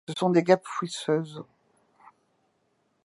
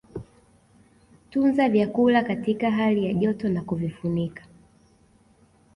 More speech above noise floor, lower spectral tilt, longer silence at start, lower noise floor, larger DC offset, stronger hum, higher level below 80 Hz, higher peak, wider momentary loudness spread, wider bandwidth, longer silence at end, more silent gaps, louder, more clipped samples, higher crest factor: first, 46 dB vs 36 dB; second, -6 dB/octave vs -8.5 dB/octave; about the same, 0.1 s vs 0.15 s; first, -72 dBFS vs -59 dBFS; neither; neither; second, -80 dBFS vs -56 dBFS; first, -6 dBFS vs -10 dBFS; first, 16 LU vs 10 LU; about the same, 11.5 kHz vs 11 kHz; first, 1.6 s vs 1.35 s; neither; about the same, -25 LUFS vs -24 LUFS; neither; first, 24 dB vs 16 dB